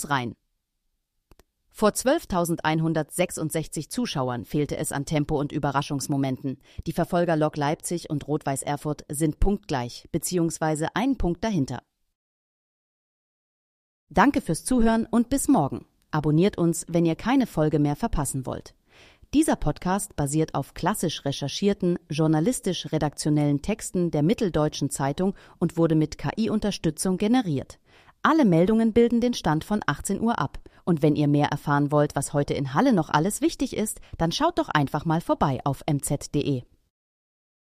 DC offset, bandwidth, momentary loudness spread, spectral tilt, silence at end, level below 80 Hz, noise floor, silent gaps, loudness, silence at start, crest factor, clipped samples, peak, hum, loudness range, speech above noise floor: under 0.1%; 15.5 kHz; 8 LU; -5.5 dB/octave; 1.05 s; -42 dBFS; -76 dBFS; 12.15-14.07 s; -25 LUFS; 0 s; 20 dB; under 0.1%; -4 dBFS; none; 4 LU; 52 dB